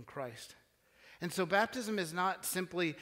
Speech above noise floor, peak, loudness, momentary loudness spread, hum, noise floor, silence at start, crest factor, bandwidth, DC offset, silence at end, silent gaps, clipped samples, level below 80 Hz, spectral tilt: 28 dB; -16 dBFS; -36 LUFS; 13 LU; none; -64 dBFS; 0 s; 22 dB; 16 kHz; under 0.1%; 0 s; none; under 0.1%; -76 dBFS; -4 dB/octave